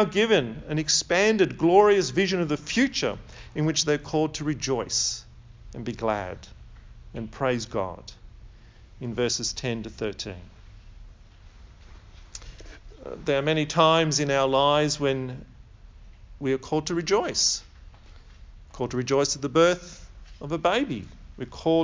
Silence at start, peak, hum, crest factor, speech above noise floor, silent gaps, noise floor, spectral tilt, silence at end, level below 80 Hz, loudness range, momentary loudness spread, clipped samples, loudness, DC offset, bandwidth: 0 s; -4 dBFS; none; 22 dB; 24 dB; none; -49 dBFS; -4 dB/octave; 0 s; -48 dBFS; 10 LU; 21 LU; under 0.1%; -24 LUFS; under 0.1%; 7.6 kHz